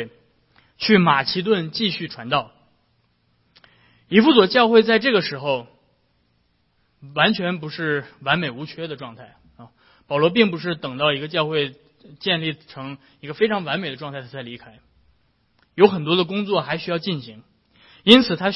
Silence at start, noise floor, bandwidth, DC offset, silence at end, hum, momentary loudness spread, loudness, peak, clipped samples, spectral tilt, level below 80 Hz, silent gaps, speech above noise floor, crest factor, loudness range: 0 s; -65 dBFS; 10 kHz; under 0.1%; 0 s; none; 20 LU; -19 LUFS; 0 dBFS; under 0.1%; -7 dB/octave; -60 dBFS; none; 45 dB; 22 dB; 6 LU